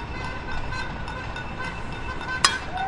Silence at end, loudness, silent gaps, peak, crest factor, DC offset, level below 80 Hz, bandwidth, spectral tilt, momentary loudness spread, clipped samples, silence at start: 0 s; -28 LUFS; none; 0 dBFS; 28 dB; under 0.1%; -36 dBFS; 11.5 kHz; -2.5 dB/octave; 11 LU; under 0.1%; 0 s